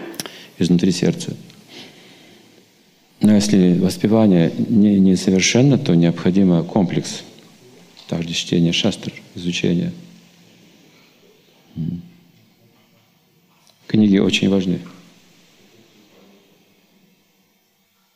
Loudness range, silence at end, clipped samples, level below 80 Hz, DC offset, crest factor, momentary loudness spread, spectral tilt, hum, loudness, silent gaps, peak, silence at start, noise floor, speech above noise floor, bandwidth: 14 LU; 3.25 s; under 0.1%; -58 dBFS; under 0.1%; 18 dB; 18 LU; -5.5 dB/octave; none; -17 LUFS; none; -2 dBFS; 0 s; -62 dBFS; 46 dB; 14 kHz